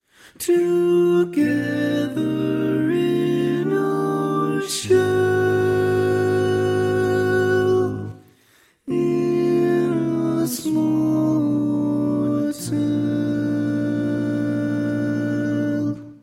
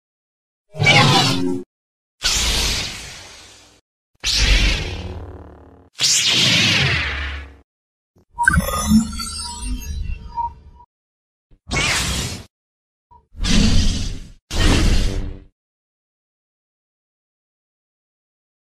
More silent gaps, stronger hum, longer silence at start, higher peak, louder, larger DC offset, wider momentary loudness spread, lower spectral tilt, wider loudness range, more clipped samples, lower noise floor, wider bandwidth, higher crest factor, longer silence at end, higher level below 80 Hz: second, none vs 1.66-2.18 s, 3.81-4.14 s, 7.64-8.14 s, 10.86-11.50 s, 12.50-13.10 s, 14.42-14.48 s; neither; second, 0.4 s vs 0.75 s; second, -6 dBFS vs 0 dBFS; about the same, -20 LUFS vs -18 LUFS; neither; second, 4 LU vs 18 LU; first, -6.5 dB/octave vs -3 dB/octave; second, 3 LU vs 8 LU; neither; first, -57 dBFS vs -45 dBFS; about the same, 16 kHz vs 15.5 kHz; second, 14 dB vs 20 dB; second, 0.05 s vs 3.3 s; second, -56 dBFS vs -26 dBFS